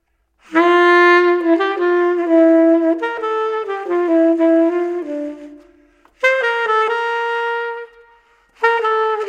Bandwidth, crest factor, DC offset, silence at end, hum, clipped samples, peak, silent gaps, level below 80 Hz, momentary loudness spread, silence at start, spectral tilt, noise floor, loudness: 7.4 kHz; 14 dB; under 0.1%; 0 s; none; under 0.1%; -2 dBFS; none; -66 dBFS; 12 LU; 0.5 s; -3.5 dB/octave; -54 dBFS; -15 LUFS